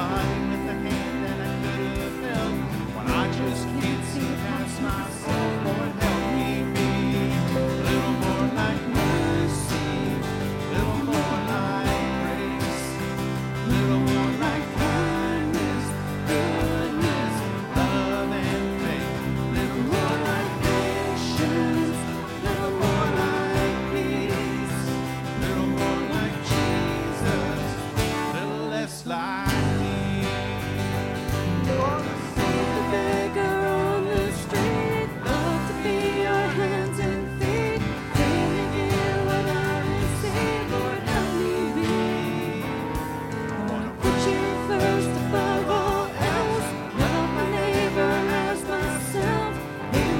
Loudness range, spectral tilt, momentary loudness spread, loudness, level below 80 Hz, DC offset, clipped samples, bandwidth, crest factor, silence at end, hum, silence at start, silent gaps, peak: 2 LU; -5.5 dB/octave; 5 LU; -25 LUFS; -40 dBFS; under 0.1%; under 0.1%; 17 kHz; 16 dB; 0 s; none; 0 s; none; -8 dBFS